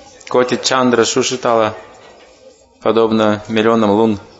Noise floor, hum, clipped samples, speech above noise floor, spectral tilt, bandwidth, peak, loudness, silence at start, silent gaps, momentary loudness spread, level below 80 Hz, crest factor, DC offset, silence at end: -45 dBFS; none; under 0.1%; 31 dB; -4 dB/octave; 8 kHz; 0 dBFS; -14 LUFS; 0.25 s; none; 6 LU; -56 dBFS; 16 dB; under 0.1%; 0.15 s